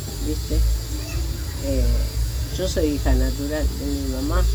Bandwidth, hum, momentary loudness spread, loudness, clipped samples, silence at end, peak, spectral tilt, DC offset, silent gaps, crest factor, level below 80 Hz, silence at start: over 20 kHz; none; 5 LU; -24 LUFS; under 0.1%; 0 s; -6 dBFS; -5.5 dB/octave; under 0.1%; none; 14 dB; -24 dBFS; 0 s